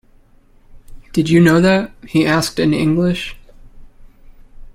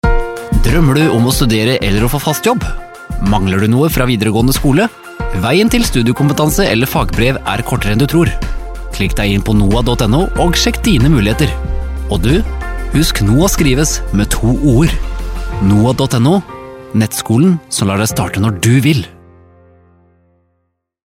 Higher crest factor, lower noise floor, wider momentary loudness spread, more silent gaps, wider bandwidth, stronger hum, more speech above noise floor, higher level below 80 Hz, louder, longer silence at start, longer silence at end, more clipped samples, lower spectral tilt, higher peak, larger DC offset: about the same, 16 dB vs 12 dB; second, -48 dBFS vs -66 dBFS; about the same, 11 LU vs 10 LU; neither; about the same, 16 kHz vs 16.5 kHz; neither; second, 34 dB vs 54 dB; second, -40 dBFS vs -20 dBFS; about the same, -15 LUFS vs -13 LUFS; first, 0.75 s vs 0.05 s; second, 0.05 s vs 2.05 s; neither; about the same, -6 dB/octave vs -5.5 dB/octave; about the same, -2 dBFS vs 0 dBFS; neither